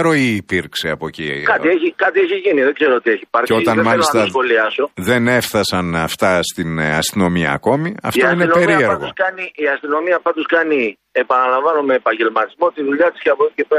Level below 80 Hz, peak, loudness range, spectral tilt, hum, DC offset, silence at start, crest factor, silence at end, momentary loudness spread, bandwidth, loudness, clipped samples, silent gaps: -50 dBFS; -2 dBFS; 2 LU; -5 dB/octave; none; under 0.1%; 0 s; 14 dB; 0 s; 6 LU; 15.5 kHz; -15 LUFS; under 0.1%; none